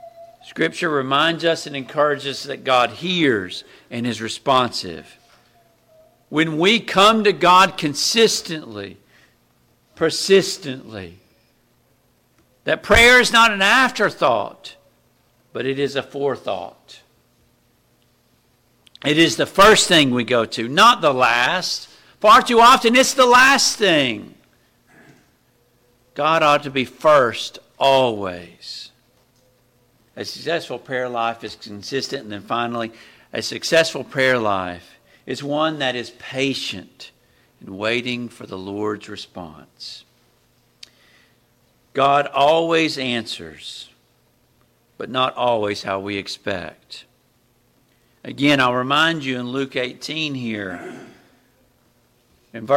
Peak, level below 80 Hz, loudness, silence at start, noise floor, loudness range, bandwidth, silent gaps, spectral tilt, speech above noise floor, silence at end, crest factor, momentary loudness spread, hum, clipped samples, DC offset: -4 dBFS; -48 dBFS; -17 LUFS; 0.05 s; -61 dBFS; 13 LU; 16.5 kHz; none; -3 dB/octave; 42 dB; 0 s; 16 dB; 21 LU; none; under 0.1%; under 0.1%